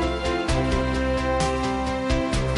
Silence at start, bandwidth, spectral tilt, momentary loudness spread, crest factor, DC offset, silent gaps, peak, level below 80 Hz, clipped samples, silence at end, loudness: 0 s; 11.5 kHz; -5.5 dB/octave; 2 LU; 12 dB; under 0.1%; none; -10 dBFS; -30 dBFS; under 0.1%; 0 s; -24 LUFS